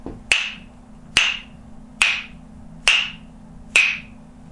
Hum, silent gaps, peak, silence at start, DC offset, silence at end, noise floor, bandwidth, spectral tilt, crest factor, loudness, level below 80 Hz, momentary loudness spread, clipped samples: none; none; 0 dBFS; 0 s; under 0.1%; 0 s; -42 dBFS; 11.5 kHz; 0 dB/octave; 24 dB; -19 LUFS; -46 dBFS; 14 LU; under 0.1%